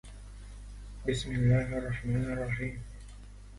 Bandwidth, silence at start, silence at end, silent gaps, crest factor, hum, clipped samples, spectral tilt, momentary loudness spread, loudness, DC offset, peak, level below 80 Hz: 11.5 kHz; 0.05 s; 0 s; none; 18 dB; 50 Hz at -40 dBFS; under 0.1%; -7 dB/octave; 23 LU; -32 LUFS; under 0.1%; -14 dBFS; -44 dBFS